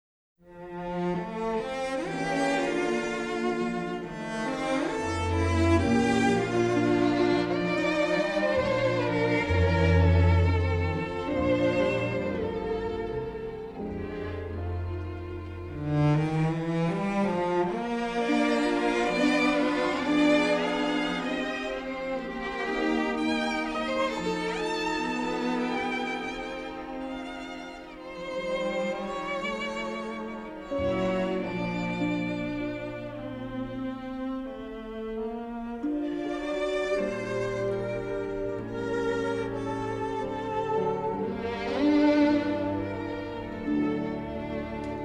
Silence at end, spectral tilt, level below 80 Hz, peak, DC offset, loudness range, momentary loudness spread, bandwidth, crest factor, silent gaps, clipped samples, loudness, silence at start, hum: 0 s; -6.5 dB/octave; -46 dBFS; -10 dBFS; under 0.1%; 8 LU; 12 LU; 11 kHz; 18 dB; none; under 0.1%; -28 LUFS; 0.45 s; none